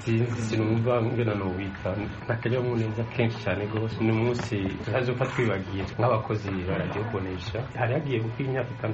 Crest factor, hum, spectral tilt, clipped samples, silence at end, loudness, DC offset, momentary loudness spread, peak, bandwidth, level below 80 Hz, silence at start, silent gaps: 16 dB; none; -6.5 dB/octave; under 0.1%; 0 s; -28 LUFS; under 0.1%; 6 LU; -10 dBFS; 8 kHz; -50 dBFS; 0 s; none